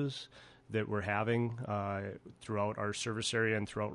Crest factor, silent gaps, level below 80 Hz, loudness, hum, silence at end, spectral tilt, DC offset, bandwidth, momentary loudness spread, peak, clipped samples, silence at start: 18 dB; none; -62 dBFS; -36 LUFS; none; 0 s; -5 dB/octave; under 0.1%; 11.5 kHz; 11 LU; -18 dBFS; under 0.1%; 0 s